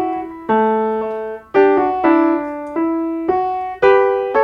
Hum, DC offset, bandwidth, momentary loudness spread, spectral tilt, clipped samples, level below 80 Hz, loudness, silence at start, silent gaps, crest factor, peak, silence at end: none; under 0.1%; 5.8 kHz; 10 LU; -7.5 dB/octave; under 0.1%; -52 dBFS; -16 LUFS; 0 s; none; 16 dB; 0 dBFS; 0 s